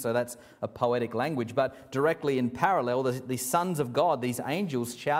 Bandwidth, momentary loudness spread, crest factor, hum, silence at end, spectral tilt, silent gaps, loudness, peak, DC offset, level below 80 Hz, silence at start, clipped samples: 16 kHz; 5 LU; 20 dB; none; 0 s; -5 dB/octave; none; -29 LUFS; -10 dBFS; under 0.1%; -66 dBFS; 0 s; under 0.1%